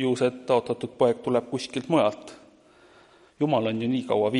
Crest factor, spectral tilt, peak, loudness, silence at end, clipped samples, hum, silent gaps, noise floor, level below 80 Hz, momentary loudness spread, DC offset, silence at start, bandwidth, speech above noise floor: 18 dB; -6 dB/octave; -8 dBFS; -25 LUFS; 0 s; under 0.1%; none; none; -55 dBFS; -68 dBFS; 8 LU; under 0.1%; 0 s; 11.5 kHz; 31 dB